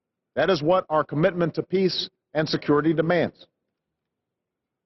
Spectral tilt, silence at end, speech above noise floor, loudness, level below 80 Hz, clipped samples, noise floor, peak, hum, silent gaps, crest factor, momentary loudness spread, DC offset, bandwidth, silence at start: -7 dB/octave; 1.55 s; 61 dB; -23 LUFS; -60 dBFS; under 0.1%; -84 dBFS; -8 dBFS; none; none; 16 dB; 7 LU; under 0.1%; 6.2 kHz; 0.35 s